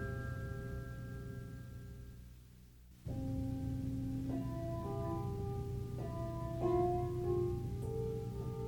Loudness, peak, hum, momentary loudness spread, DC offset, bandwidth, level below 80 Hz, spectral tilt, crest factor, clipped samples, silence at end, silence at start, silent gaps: -41 LUFS; -24 dBFS; none; 16 LU; under 0.1%; 19 kHz; -50 dBFS; -8.5 dB/octave; 16 dB; under 0.1%; 0 s; 0 s; none